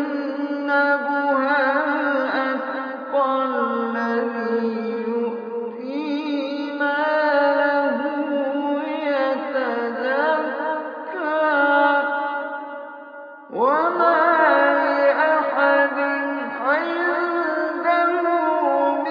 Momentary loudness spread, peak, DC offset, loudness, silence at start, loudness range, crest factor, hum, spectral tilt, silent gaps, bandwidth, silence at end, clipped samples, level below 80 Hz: 10 LU; -4 dBFS; under 0.1%; -21 LUFS; 0 s; 5 LU; 16 dB; none; -6 dB/octave; none; 5.4 kHz; 0 s; under 0.1%; under -90 dBFS